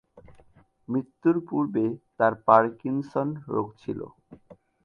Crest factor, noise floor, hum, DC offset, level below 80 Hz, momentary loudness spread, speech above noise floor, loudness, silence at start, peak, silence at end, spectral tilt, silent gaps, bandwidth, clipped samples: 24 dB; -58 dBFS; none; under 0.1%; -64 dBFS; 15 LU; 33 dB; -26 LUFS; 0.15 s; -4 dBFS; 0.3 s; -9.5 dB/octave; none; 6.6 kHz; under 0.1%